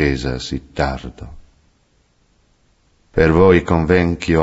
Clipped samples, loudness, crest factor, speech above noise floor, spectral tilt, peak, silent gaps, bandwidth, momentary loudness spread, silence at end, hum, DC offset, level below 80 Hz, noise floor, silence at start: under 0.1%; -16 LUFS; 18 dB; 43 dB; -7 dB/octave; 0 dBFS; none; 8 kHz; 20 LU; 0 s; none; under 0.1%; -32 dBFS; -59 dBFS; 0 s